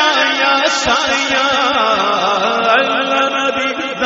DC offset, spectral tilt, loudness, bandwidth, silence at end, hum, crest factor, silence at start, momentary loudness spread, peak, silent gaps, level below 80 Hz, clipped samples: under 0.1%; 0.5 dB/octave; -13 LUFS; 8 kHz; 0 s; none; 14 dB; 0 s; 3 LU; -2 dBFS; none; -50 dBFS; under 0.1%